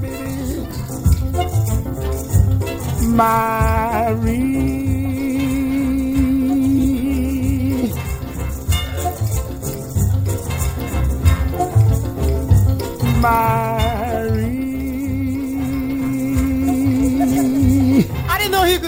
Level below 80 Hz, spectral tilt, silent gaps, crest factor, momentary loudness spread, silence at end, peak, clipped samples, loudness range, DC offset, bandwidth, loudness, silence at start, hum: -26 dBFS; -6.5 dB/octave; none; 16 dB; 8 LU; 0 s; -2 dBFS; under 0.1%; 3 LU; under 0.1%; over 20 kHz; -18 LUFS; 0 s; none